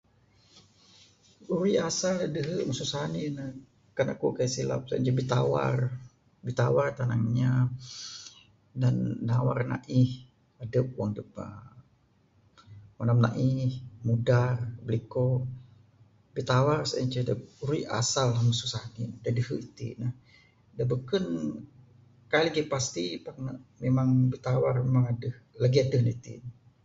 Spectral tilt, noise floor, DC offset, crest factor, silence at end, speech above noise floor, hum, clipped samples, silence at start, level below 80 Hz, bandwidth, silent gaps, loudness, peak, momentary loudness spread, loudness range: -6 dB/octave; -65 dBFS; under 0.1%; 20 dB; 0.3 s; 38 dB; none; under 0.1%; 1.4 s; -58 dBFS; 7.8 kHz; none; -29 LUFS; -10 dBFS; 15 LU; 4 LU